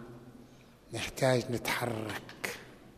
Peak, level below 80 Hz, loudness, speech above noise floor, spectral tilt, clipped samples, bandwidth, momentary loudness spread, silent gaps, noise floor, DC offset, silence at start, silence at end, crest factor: -14 dBFS; -62 dBFS; -34 LUFS; 24 dB; -4.5 dB/octave; under 0.1%; 15 kHz; 20 LU; none; -56 dBFS; under 0.1%; 0 s; 0 s; 22 dB